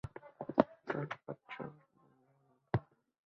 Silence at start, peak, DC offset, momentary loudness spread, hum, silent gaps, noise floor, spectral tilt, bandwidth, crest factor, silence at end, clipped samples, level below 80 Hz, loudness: 0.05 s; -10 dBFS; under 0.1%; 15 LU; none; none; -73 dBFS; -6.5 dB/octave; 7.2 kHz; 32 dB; 0.45 s; under 0.1%; -64 dBFS; -39 LUFS